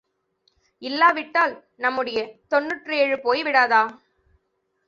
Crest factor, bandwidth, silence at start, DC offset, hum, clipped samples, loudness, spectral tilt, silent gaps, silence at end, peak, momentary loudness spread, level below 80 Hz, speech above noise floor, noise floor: 20 dB; 7.6 kHz; 0.8 s; under 0.1%; none; under 0.1%; -21 LUFS; -3.5 dB/octave; none; 0.9 s; -4 dBFS; 10 LU; -70 dBFS; 51 dB; -73 dBFS